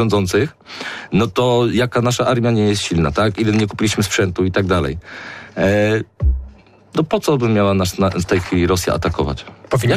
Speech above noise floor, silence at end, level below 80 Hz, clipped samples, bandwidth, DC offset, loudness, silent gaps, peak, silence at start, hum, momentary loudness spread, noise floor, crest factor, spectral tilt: 25 dB; 0 s; -32 dBFS; under 0.1%; 15.5 kHz; under 0.1%; -17 LUFS; none; -6 dBFS; 0 s; none; 9 LU; -41 dBFS; 12 dB; -5.5 dB/octave